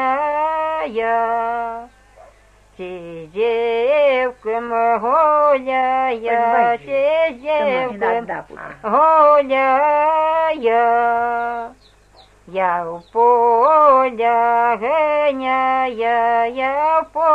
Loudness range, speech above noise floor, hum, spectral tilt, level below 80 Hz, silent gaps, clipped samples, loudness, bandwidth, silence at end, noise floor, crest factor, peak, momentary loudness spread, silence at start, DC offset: 6 LU; 33 dB; none; -5.5 dB/octave; -54 dBFS; none; under 0.1%; -16 LUFS; 8.8 kHz; 0 s; -50 dBFS; 14 dB; -2 dBFS; 12 LU; 0 s; under 0.1%